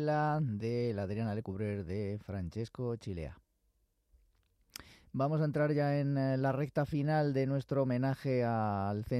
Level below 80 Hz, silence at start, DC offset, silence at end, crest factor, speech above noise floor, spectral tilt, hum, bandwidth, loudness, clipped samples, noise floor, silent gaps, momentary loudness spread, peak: -62 dBFS; 0 s; under 0.1%; 0 s; 14 dB; 43 dB; -8.5 dB/octave; none; 14 kHz; -34 LUFS; under 0.1%; -76 dBFS; none; 10 LU; -20 dBFS